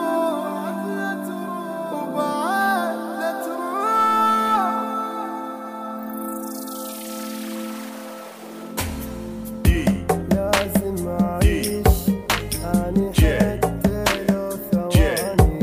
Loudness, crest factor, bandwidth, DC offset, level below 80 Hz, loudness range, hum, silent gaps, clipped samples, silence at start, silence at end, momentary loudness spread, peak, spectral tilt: -22 LUFS; 20 dB; 16 kHz; under 0.1%; -30 dBFS; 10 LU; none; none; under 0.1%; 0 s; 0 s; 13 LU; 0 dBFS; -5.5 dB/octave